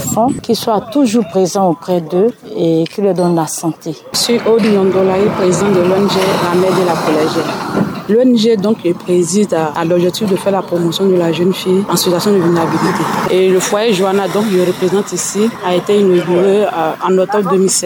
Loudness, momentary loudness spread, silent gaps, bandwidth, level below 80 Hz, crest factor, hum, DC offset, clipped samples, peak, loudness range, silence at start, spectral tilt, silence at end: -13 LUFS; 5 LU; none; 20 kHz; -54 dBFS; 10 dB; none; under 0.1%; under 0.1%; -2 dBFS; 2 LU; 0 s; -5 dB/octave; 0 s